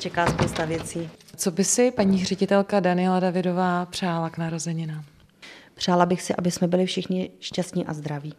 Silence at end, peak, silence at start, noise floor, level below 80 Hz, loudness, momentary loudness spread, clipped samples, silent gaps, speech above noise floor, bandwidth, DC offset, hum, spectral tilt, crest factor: 0.05 s; -4 dBFS; 0 s; -48 dBFS; -52 dBFS; -24 LUFS; 10 LU; under 0.1%; none; 24 dB; 14.5 kHz; under 0.1%; none; -5 dB/octave; 20 dB